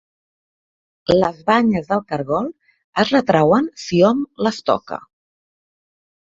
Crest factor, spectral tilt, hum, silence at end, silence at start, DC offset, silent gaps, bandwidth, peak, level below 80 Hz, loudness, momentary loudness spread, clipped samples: 18 dB; -6 dB/octave; none; 1.3 s; 1.1 s; under 0.1%; 2.84-2.93 s; 7.8 kHz; 0 dBFS; -52 dBFS; -18 LUFS; 11 LU; under 0.1%